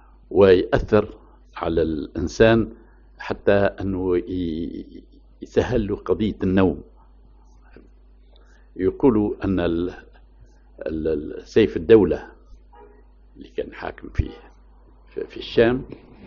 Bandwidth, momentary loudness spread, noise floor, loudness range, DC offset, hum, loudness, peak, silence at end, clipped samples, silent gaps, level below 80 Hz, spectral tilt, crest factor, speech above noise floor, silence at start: 7.2 kHz; 19 LU; -50 dBFS; 5 LU; under 0.1%; none; -21 LUFS; -2 dBFS; 0 s; under 0.1%; none; -38 dBFS; -6 dB/octave; 22 dB; 29 dB; 0.3 s